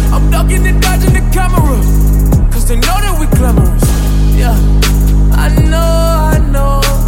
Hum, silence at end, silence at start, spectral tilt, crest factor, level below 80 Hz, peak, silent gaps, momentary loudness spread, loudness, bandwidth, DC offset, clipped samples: none; 0 s; 0 s; -5.5 dB/octave; 8 dB; -10 dBFS; 0 dBFS; none; 2 LU; -11 LUFS; 16.5 kHz; under 0.1%; under 0.1%